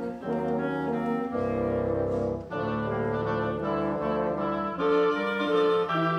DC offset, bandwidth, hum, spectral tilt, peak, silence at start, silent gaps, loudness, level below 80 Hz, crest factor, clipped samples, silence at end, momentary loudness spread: under 0.1%; 8.2 kHz; none; -8 dB/octave; -14 dBFS; 0 s; none; -28 LUFS; -52 dBFS; 14 dB; under 0.1%; 0 s; 6 LU